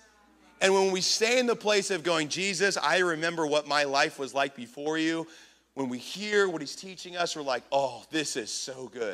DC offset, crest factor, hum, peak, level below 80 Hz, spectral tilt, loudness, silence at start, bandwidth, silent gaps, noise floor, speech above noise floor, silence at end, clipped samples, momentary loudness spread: under 0.1%; 24 dB; none; -6 dBFS; -76 dBFS; -2.5 dB/octave; -28 LUFS; 0.6 s; 15 kHz; none; -60 dBFS; 31 dB; 0 s; under 0.1%; 12 LU